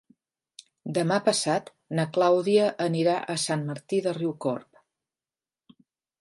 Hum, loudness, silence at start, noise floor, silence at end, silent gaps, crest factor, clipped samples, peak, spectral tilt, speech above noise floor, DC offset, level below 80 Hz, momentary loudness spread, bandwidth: none; -26 LUFS; 0.85 s; under -90 dBFS; 1.6 s; none; 18 dB; under 0.1%; -8 dBFS; -5 dB/octave; over 65 dB; under 0.1%; -76 dBFS; 9 LU; 11.5 kHz